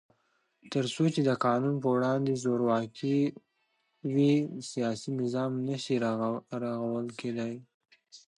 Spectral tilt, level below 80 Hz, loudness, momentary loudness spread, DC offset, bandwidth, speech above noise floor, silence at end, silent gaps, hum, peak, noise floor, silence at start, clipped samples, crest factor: -6.5 dB/octave; -76 dBFS; -30 LUFS; 8 LU; under 0.1%; 11 kHz; 47 dB; 0.2 s; 7.74-7.80 s; none; -14 dBFS; -76 dBFS; 0.65 s; under 0.1%; 16 dB